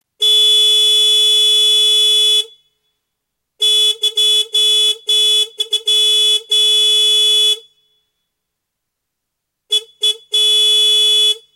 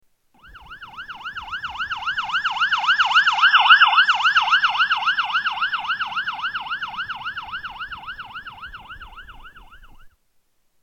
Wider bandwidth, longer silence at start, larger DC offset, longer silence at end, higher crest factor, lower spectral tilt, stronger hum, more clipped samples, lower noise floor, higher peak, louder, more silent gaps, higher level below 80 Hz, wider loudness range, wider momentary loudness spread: first, 16.5 kHz vs 8.8 kHz; second, 0.2 s vs 0.45 s; neither; second, 0.15 s vs 0.75 s; second, 10 dB vs 22 dB; second, 5.5 dB/octave vs 0.5 dB/octave; neither; neither; first, -76 dBFS vs -64 dBFS; second, -4 dBFS vs 0 dBFS; first, -10 LUFS vs -18 LUFS; neither; second, -80 dBFS vs -52 dBFS; second, 5 LU vs 18 LU; second, 7 LU vs 22 LU